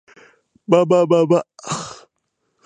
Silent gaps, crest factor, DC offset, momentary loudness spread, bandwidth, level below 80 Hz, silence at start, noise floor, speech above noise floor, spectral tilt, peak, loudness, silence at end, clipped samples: none; 18 dB; under 0.1%; 17 LU; 9.6 kHz; -66 dBFS; 0.7 s; -72 dBFS; 57 dB; -6 dB/octave; 0 dBFS; -17 LUFS; 0.7 s; under 0.1%